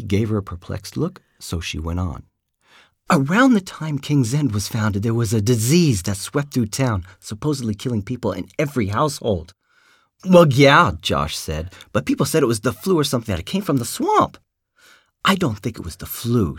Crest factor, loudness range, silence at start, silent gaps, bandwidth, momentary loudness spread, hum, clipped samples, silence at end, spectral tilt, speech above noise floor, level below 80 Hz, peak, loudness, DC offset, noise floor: 20 dB; 6 LU; 0 s; none; 17.5 kHz; 13 LU; none; under 0.1%; 0 s; -5.5 dB/octave; 38 dB; -42 dBFS; 0 dBFS; -20 LUFS; under 0.1%; -58 dBFS